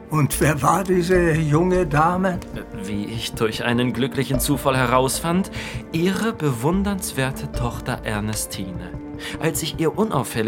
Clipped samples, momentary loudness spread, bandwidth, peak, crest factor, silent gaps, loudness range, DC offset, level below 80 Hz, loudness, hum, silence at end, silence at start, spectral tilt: under 0.1%; 11 LU; 18 kHz; -2 dBFS; 20 dB; none; 5 LU; under 0.1%; -36 dBFS; -21 LUFS; none; 0 s; 0 s; -5 dB/octave